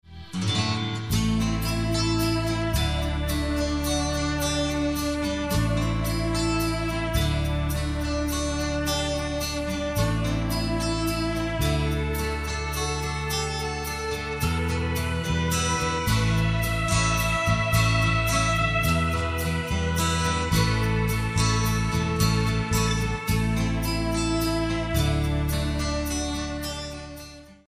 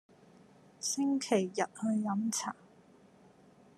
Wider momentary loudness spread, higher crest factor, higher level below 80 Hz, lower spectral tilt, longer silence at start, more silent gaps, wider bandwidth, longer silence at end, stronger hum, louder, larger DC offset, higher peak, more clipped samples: second, 5 LU vs 8 LU; second, 16 dB vs 22 dB; first, -32 dBFS vs -84 dBFS; about the same, -4.5 dB/octave vs -4 dB/octave; second, 0.1 s vs 0.8 s; neither; first, 15.5 kHz vs 13.5 kHz; second, 0.15 s vs 1.25 s; neither; first, -25 LUFS vs -33 LUFS; neither; first, -8 dBFS vs -14 dBFS; neither